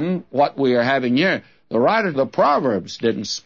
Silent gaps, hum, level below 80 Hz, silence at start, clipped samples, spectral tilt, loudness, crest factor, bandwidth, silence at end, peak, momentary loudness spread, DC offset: none; none; -64 dBFS; 0 s; under 0.1%; -5.5 dB/octave; -19 LUFS; 14 dB; 7.4 kHz; 0.05 s; -4 dBFS; 6 LU; 0.1%